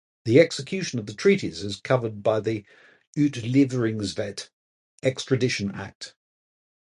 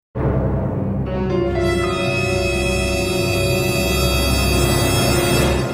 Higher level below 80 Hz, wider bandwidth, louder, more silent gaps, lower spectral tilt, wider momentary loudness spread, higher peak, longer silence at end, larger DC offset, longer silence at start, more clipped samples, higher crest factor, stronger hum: second, -58 dBFS vs -26 dBFS; second, 11.5 kHz vs 16 kHz; second, -24 LUFS vs -18 LUFS; first, 3.07-3.13 s, 4.53-4.98 s, 5.95-6.01 s vs none; about the same, -6 dB/octave vs -5 dB/octave; first, 15 LU vs 5 LU; about the same, -4 dBFS vs -4 dBFS; first, 0.9 s vs 0 s; neither; about the same, 0.25 s vs 0.15 s; neither; first, 22 dB vs 14 dB; neither